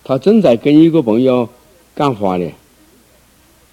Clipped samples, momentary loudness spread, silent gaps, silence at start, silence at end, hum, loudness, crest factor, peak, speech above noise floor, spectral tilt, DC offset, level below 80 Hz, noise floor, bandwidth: under 0.1%; 14 LU; none; 0.1 s; 1.2 s; none; -12 LUFS; 14 dB; 0 dBFS; 38 dB; -8 dB/octave; under 0.1%; -54 dBFS; -49 dBFS; 12 kHz